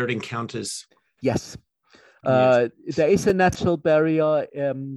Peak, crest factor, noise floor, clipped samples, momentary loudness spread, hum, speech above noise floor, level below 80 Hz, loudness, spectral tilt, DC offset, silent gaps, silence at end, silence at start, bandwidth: -6 dBFS; 16 dB; -56 dBFS; under 0.1%; 12 LU; none; 34 dB; -52 dBFS; -22 LUFS; -6 dB/octave; under 0.1%; none; 0 s; 0 s; 12.5 kHz